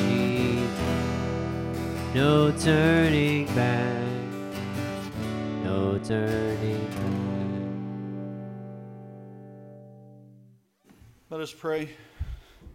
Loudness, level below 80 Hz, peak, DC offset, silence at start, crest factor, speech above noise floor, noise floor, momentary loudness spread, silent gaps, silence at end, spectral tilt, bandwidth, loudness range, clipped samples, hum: -27 LUFS; -46 dBFS; -10 dBFS; under 0.1%; 0 s; 18 dB; 34 dB; -59 dBFS; 21 LU; none; 0 s; -6.5 dB/octave; 16.5 kHz; 16 LU; under 0.1%; none